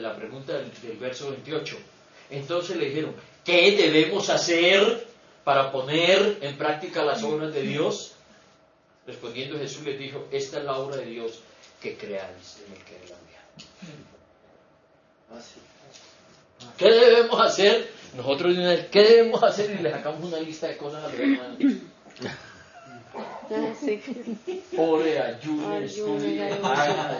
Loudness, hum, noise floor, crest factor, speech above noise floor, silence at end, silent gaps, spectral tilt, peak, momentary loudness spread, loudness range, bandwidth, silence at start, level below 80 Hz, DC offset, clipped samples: -23 LUFS; none; -60 dBFS; 22 dB; 36 dB; 0 s; none; -4 dB/octave; -4 dBFS; 20 LU; 13 LU; 7.4 kHz; 0 s; -72 dBFS; under 0.1%; under 0.1%